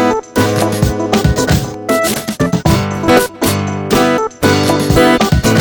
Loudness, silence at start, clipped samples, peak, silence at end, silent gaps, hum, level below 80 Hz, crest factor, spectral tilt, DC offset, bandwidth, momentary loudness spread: -13 LUFS; 0 s; under 0.1%; 0 dBFS; 0 s; none; none; -26 dBFS; 12 dB; -5 dB/octave; under 0.1%; over 20 kHz; 5 LU